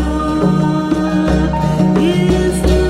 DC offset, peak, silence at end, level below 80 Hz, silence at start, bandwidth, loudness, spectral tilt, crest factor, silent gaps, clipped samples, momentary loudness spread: under 0.1%; 0 dBFS; 0 s; -22 dBFS; 0 s; 13.5 kHz; -14 LUFS; -7 dB/octave; 12 dB; none; under 0.1%; 3 LU